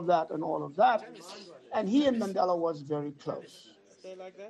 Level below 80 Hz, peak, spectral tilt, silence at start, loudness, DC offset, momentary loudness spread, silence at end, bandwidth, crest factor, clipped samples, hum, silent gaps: -74 dBFS; -14 dBFS; -6 dB/octave; 0 s; -30 LUFS; under 0.1%; 20 LU; 0 s; 12 kHz; 16 dB; under 0.1%; none; none